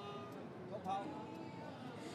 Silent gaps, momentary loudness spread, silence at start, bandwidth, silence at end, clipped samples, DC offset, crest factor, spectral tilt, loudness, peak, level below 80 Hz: none; 7 LU; 0 s; 13.5 kHz; 0 s; under 0.1%; under 0.1%; 16 dB; -6 dB/octave; -47 LUFS; -30 dBFS; -88 dBFS